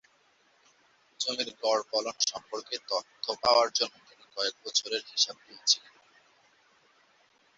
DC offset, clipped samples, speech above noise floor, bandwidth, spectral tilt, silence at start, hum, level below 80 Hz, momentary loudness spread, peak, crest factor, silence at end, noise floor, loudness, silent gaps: under 0.1%; under 0.1%; 36 dB; 8 kHz; 0.5 dB/octave; 1.2 s; none; -74 dBFS; 10 LU; -8 dBFS; 24 dB; 1.8 s; -67 dBFS; -29 LUFS; none